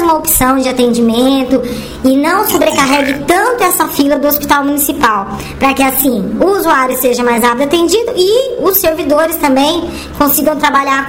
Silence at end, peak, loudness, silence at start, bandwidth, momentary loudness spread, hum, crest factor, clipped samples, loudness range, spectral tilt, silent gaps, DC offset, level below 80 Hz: 0 s; 0 dBFS; -11 LUFS; 0 s; 17 kHz; 4 LU; none; 10 dB; under 0.1%; 1 LU; -3.5 dB/octave; none; 0.5%; -34 dBFS